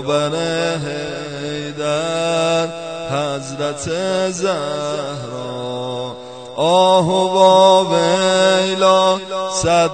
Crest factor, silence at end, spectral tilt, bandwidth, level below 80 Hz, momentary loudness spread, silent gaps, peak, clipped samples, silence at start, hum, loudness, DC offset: 16 dB; 0 s; -4 dB/octave; 9.2 kHz; -52 dBFS; 14 LU; none; 0 dBFS; under 0.1%; 0 s; none; -17 LUFS; 0.3%